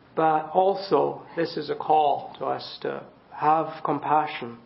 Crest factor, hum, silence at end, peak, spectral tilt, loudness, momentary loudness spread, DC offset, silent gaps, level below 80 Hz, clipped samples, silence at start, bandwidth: 18 dB; none; 0.05 s; -6 dBFS; -10 dB/octave; -25 LUFS; 10 LU; under 0.1%; none; -70 dBFS; under 0.1%; 0.15 s; 5.8 kHz